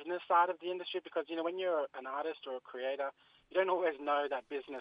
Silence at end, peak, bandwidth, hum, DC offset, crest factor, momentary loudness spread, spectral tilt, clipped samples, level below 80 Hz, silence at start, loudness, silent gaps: 0 s; -16 dBFS; 5.2 kHz; none; under 0.1%; 18 dB; 10 LU; -6 dB/octave; under 0.1%; -84 dBFS; 0 s; -36 LUFS; none